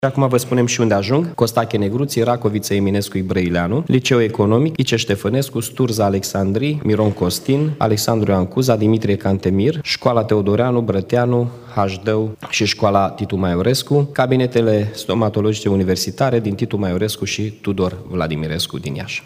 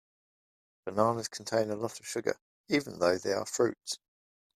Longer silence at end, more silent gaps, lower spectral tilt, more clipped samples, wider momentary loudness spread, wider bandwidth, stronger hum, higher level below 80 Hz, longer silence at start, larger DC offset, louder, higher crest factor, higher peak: second, 0.05 s vs 0.6 s; second, none vs 2.41-2.64 s; first, -5.5 dB/octave vs -4 dB/octave; neither; second, 5 LU vs 10 LU; first, 16 kHz vs 14.5 kHz; neither; first, -48 dBFS vs -72 dBFS; second, 0 s vs 0.85 s; neither; first, -18 LUFS vs -32 LUFS; second, 16 dB vs 22 dB; first, 0 dBFS vs -10 dBFS